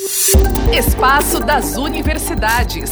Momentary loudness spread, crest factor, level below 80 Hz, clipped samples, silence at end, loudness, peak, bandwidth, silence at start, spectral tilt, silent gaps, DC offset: 7 LU; 14 dB; -18 dBFS; under 0.1%; 0 s; -14 LUFS; 0 dBFS; over 20 kHz; 0 s; -3.5 dB/octave; none; under 0.1%